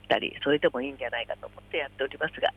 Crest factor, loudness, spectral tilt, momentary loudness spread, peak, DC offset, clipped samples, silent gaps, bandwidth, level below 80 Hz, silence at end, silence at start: 20 dB; -29 LUFS; -6 dB/octave; 9 LU; -10 dBFS; under 0.1%; under 0.1%; none; 9.8 kHz; -58 dBFS; 0.05 s; 0.1 s